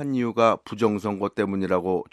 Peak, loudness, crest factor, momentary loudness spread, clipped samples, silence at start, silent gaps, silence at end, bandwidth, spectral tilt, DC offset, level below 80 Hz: -4 dBFS; -24 LUFS; 20 dB; 5 LU; under 0.1%; 0 s; none; 0.1 s; 13 kHz; -7 dB/octave; under 0.1%; -64 dBFS